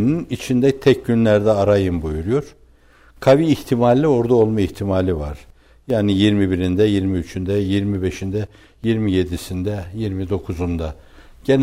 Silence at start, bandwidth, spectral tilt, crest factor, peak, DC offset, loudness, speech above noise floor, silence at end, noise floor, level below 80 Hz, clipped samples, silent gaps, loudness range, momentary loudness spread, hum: 0 s; 16 kHz; -7.5 dB/octave; 16 dB; -4 dBFS; under 0.1%; -19 LUFS; 32 dB; 0 s; -50 dBFS; -38 dBFS; under 0.1%; none; 5 LU; 10 LU; none